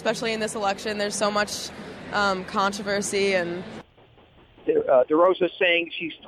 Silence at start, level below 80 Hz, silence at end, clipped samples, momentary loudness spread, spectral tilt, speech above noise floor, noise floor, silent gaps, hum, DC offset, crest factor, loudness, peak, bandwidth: 0 s; -58 dBFS; 0 s; under 0.1%; 13 LU; -3.5 dB/octave; 30 dB; -54 dBFS; none; none; under 0.1%; 16 dB; -24 LUFS; -8 dBFS; 14 kHz